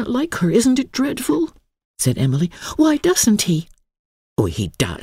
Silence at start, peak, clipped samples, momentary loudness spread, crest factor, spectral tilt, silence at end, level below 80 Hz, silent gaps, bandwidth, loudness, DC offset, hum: 0 s; -2 dBFS; under 0.1%; 7 LU; 16 dB; -5 dB/octave; 0.05 s; -44 dBFS; 1.85-1.94 s, 3.99-4.36 s; 16 kHz; -19 LUFS; under 0.1%; none